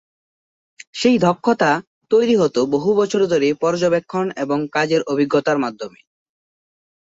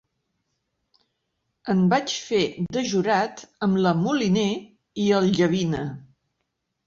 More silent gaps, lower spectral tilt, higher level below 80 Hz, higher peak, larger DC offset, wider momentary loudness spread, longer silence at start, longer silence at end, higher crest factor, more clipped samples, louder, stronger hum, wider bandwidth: first, 1.87-2.01 s vs none; about the same, -5.5 dB/octave vs -5.5 dB/octave; about the same, -62 dBFS vs -58 dBFS; first, -2 dBFS vs -8 dBFS; neither; second, 7 LU vs 11 LU; second, 0.95 s vs 1.65 s; first, 1.3 s vs 0.85 s; about the same, 16 dB vs 16 dB; neither; first, -18 LUFS vs -23 LUFS; neither; about the same, 8 kHz vs 7.4 kHz